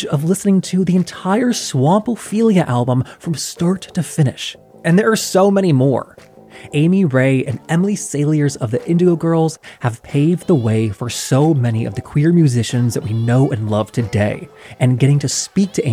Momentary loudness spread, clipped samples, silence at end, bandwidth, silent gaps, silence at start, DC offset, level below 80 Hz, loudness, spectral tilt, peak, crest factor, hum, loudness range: 8 LU; under 0.1%; 0 s; 15.5 kHz; none; 0 s; under 0.1%; -52 dBFS; -16 LUFS; -6 dB/octave; -2 dBFS; 14 dB; none; 1 LU